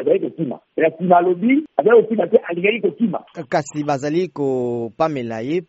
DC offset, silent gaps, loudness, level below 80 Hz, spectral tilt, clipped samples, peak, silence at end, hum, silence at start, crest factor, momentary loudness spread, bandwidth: under 0.1%; none; -19 LUFS; -66 dBFS; -5.5 dB/octave; under 0.1%; 0 dBFS; 0.05 s; none; 0 s; 18 dB; 10 LU; 8 kHz